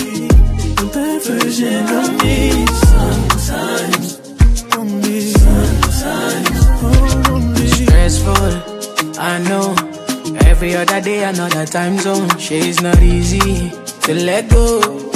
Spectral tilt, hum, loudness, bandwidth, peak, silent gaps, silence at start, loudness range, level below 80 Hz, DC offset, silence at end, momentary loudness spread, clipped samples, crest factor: -5 dB/octave; none; -14 LUFS; 15.5 kHz; 0 dBFS; none; 0 s; 2 LU; -16 dBFS; under 0.1%; 0 s; 7 LU; under 0.1%; 12 dB